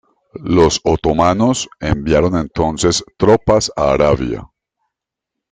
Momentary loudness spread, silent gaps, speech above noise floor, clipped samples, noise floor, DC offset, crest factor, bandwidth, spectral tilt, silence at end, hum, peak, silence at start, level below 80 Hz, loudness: 7 LU; none; 67 dB; under 0.1%; -81 dBFS; under 0.1%; 16 dB; 9.6 kHz; -5 dB/octave; 1.05 s; none; 0 dBFS; 0.35 s; -34 dBFS; -15 LUFS